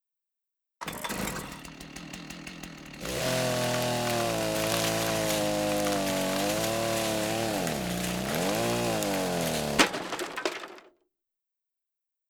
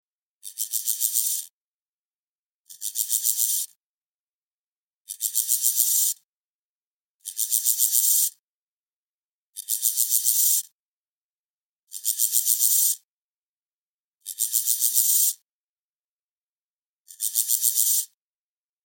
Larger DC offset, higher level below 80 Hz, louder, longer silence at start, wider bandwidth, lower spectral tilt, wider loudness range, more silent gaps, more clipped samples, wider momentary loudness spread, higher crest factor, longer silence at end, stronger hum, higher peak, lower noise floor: neither; first, -52 dBFS vs under -90 dBFS; second, -28 LUFS vs -21 LUFS; first, 0.8 s vs 0.45 s; first, over 20 kHz vs 17 kHz; first, -3.5 dB/octave vs 8 dB/octave; about the same, 5 LU vs 5 LU; second, none vs 1.53-2.65 s, 3.76-5.05 s, 6.25-7.20 s, 8.39-9.53 s, 10.72-11.87 s, 13.04-14.18 s, 15.42-17.05 s; neither; second, 14 LU vs 17 LU; about the same, 26 dB vs 24 dB; first, 1.4 s vs 0.8 s; neither; second, -6 dBFS vs -2 dBFS; about the same, -87 dBFS vs under -90 dBFS